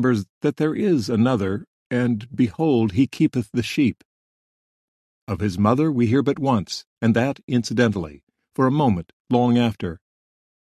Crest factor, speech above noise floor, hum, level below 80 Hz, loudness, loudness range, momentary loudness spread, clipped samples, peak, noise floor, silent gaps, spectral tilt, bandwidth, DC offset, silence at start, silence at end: 18 dB; over 70 dB; none; -48 dBFS; -21 LUFS; 2 LU; 11 LU; under 0.1%; -2 dBFS; under -90 dBFS; 0.30-0.41 s, 1.67-1.90 s, 4.05-5.27 s, 6.87-6.97 s, 7.43-7.48 s, 8.23-8.27 s, 9.13-9.25 s; -7 dB/octave; 13 kHz; under 0.1%; 0 s; 0.65 s